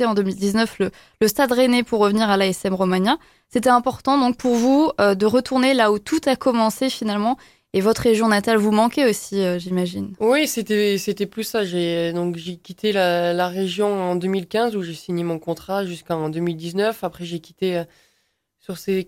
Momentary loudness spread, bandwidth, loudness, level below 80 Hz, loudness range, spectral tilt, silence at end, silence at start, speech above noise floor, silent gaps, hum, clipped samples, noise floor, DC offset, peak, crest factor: 9 LU; 16.5 kHz; -20 LUFS; -56 dBFS; 6 LU; -5 dB/octave; 0.05 s; 0 s; 49 dB; none; none; under 0.1%; -69 dBFS; under 0.1%; -4 dBFS; 16 dB